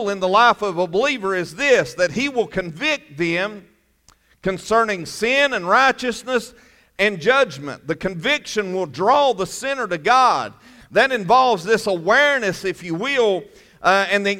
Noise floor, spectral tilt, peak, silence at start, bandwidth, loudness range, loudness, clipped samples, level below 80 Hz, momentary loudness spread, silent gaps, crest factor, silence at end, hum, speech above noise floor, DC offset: -57 dBFS; -3.5 dB/octave; -2 dBFS; 0 s; 16 kHz; 4 LU; -19 LUFS; under 0.1%; -54 dBFS; 10 LU; none; 16 dB; 0 s; none; 38 dB; under 0.1%